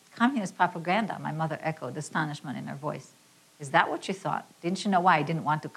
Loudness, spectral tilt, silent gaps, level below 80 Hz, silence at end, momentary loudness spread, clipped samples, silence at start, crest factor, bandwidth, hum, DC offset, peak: -29 LUFS; -5.5 dB/octave; none; -78 dBFS; 0.05 s; 12 LU; under 0.1%; 0.15 s; 22 dB; 14 kHz; none; under 0.1%; -6 dBFS